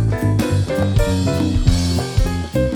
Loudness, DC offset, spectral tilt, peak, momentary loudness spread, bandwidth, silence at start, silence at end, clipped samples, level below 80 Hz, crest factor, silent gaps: -18 LUFS; under 0.1%; -6.5 dB/octave; 0 dBFS; 3 LU; 18 kHz; 0 s; 0 s; under 0.1%; -24 dBFS; 16 dB; none